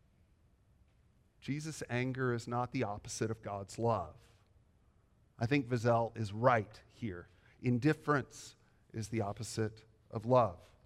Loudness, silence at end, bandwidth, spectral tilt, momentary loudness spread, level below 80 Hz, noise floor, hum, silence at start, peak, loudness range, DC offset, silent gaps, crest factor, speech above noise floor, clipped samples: -36 LUFS; 0.25 s; 13.5 kHz; -6.5 dB/octave; 15 LU; -66 dBFS; -69 dBFS; none; 1.45 s; -14 dBFS; 5 LU; under 0.1%; none; 24 dB; 34 dB; under 0.1%